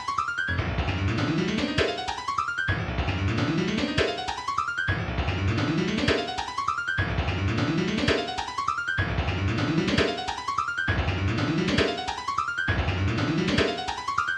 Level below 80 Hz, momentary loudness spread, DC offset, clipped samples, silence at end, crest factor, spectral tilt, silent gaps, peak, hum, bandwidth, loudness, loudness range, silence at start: -40 dBFS; 4 LU; under 0.1%; under 0.1%; 0 s; 16 dB; -5.5 dB/octave; none; -10 dBFS; none; 10.5 kHz; -26 LUFS; 1 LU; 0 s